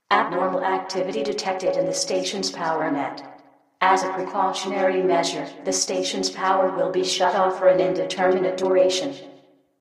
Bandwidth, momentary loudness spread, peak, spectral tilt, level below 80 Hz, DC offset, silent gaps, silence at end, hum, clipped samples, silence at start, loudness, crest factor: 13 kHz; 7 LU; -4 dBFS; -3 dB/octave; -70 dBFS; under 0.1%; none; 0.45 s; none; under 0.1%; 0.1 s; -22 LUFS; 18 dB